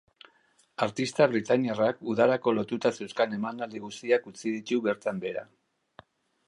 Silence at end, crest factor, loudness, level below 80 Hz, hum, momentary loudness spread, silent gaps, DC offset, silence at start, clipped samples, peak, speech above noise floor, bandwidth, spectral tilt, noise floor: 1.05 s; 20 dB; -28 LUFS; -72 dBFS; none; 12 LU; none; under 0.1%; 0.8 s; under 0.1%; -8 dBFS; 38 dB; 11.5 kHz; -5.5 dB/octave; -66 dBFS